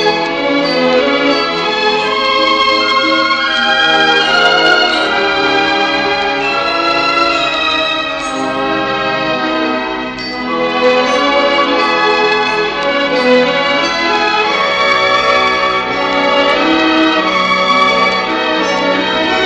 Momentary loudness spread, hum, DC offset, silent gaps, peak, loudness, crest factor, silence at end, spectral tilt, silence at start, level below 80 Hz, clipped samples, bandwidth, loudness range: 5 LU; none; under 0.1%; none; 0 dBFS; -11 LUFS; 12 dB; 0 s; -3 dB/octave; 0 s; -44 dBFS; under 0.1%; 9.4 kHz; 4 LU